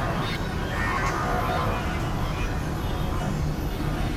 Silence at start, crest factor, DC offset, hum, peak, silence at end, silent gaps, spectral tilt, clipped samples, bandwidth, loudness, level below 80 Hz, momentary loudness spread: 0 s; 12 dB; under 0.1%; none; -14 dBFS; 0 s; none; -6 dB/octave; under 0.1%; 16 kHz; -27 LUFS; -32 dBFS; 4 LU